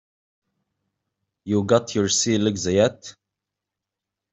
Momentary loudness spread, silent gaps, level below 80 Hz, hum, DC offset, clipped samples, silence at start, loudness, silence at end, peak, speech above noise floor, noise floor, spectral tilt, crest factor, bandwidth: 9 LU; none; -62 dBFS; none; under 0.1%; under 0.1%; 1.45 s; -21 LUFS; 1.2 s; -4 dBFS; 65 dB; -86 dBFS; -4 dB/octave; 20 dB; 8.2 kHz